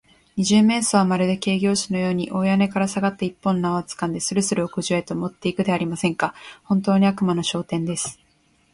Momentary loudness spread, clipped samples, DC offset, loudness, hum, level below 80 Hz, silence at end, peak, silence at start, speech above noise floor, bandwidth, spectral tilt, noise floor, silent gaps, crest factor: 8 LU; under 0.1%; under 0.1%; -22 LUFS; none; -58 dBFS; 0.6 s; -6 dBFS; 0.35 s; 40 dB; 11.5 kHz; -5 dB/octave; -61 dBFS; none; 16 dB